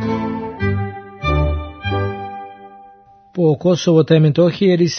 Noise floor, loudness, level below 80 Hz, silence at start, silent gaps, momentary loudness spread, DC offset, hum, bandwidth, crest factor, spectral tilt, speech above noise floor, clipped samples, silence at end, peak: -46 dBFS; -17 LUFS; -32 dBFS; 0 s; none; 16 LU; under 0.1%; none; 6.6 kHz; 16 dB; -7 dB/octave; 33 dB; under 0.1%; 0 s; 0 dBFS